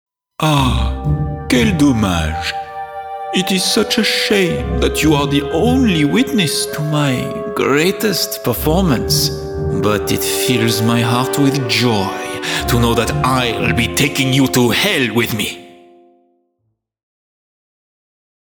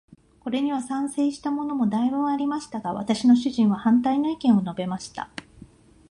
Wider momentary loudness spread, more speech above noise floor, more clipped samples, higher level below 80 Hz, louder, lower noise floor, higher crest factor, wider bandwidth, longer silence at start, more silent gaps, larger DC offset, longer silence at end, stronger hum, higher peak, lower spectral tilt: second, 7 LU vs 13 LU; first, 54 dB vs 27 dB; neither; first, -30 dBFS vs -60 dBFS; first, -15 LUFS vs -24 LUFS; first, -69 dBFS vs -50 dBFS; about the same, 14 dB vs 16 dB; first, over 20 kHz vs 11 kHz; about the same, 0.4 s vs 0.45 s; neither; neither; first, 2.85 s vs 0.45 s; neither; first, -2 dBFS vs -8 dBFS; second, -4.5 dB/octave vs -6 dB/octave